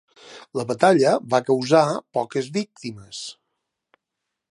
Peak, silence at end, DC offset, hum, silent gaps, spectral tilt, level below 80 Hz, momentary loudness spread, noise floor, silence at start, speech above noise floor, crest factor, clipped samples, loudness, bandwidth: -2 dBFS; 1.2 s; under 0.1%; none; none; -5 dB/octave; -68 dBFS; 17 LU; -82 dBFS; 0.3 s; 61 dB; 22 dB; under 0.1%; -21 LUFS; 11.5 kHz